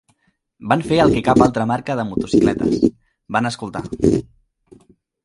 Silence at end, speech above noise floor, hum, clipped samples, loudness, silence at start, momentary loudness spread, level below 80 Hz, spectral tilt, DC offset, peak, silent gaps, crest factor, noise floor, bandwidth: 1 s; 47 dB; none; under 0.1%; -18 LUFS; 0.6 s; 9 LU; -42 dBFS; -6.5 dB/octave; under 0.1%; 0 dBFS; none; 18 dB; -64 dBFS; 11.5 kHz